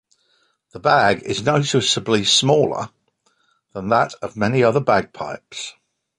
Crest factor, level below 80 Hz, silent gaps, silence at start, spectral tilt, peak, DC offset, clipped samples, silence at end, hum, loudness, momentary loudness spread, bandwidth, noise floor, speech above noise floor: 18 dB; -54 dBFS; none; 0.75 s; -4 dB/octave; -2 dBFS; under 0.1%; under 0.1%; 0.5 s; none; -18 LUFS; 16 LU; 11.5 kHz; -65 dBFS; 46 dB